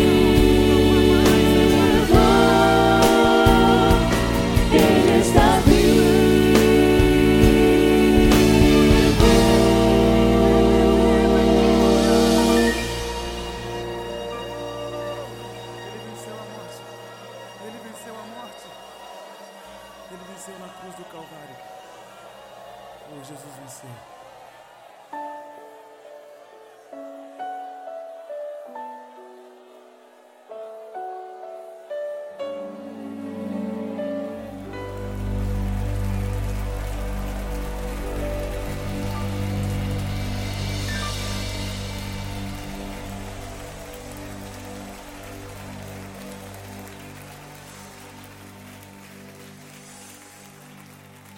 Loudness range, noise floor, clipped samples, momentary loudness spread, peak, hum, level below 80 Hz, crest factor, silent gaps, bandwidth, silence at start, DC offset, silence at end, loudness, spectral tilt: 25 LU; -50 dBFS; under 0.1%; 24 LU; 0 dBFS; none; -30 dBFS; 20 dB; none; 17 kHz; 0 s; under 0.1%; 1.25 s; -18 LUFS; -5.5 dB/octave